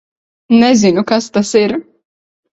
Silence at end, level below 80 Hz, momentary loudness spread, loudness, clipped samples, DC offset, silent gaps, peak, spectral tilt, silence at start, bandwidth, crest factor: 0.7 s; -54 dBFS; 7 LU; -12 LUFS; under 0.1%; under 0.1%; none; 0 dBFS; -5 dB/octave; 0.5 s; 8.2 kHz; 14 dB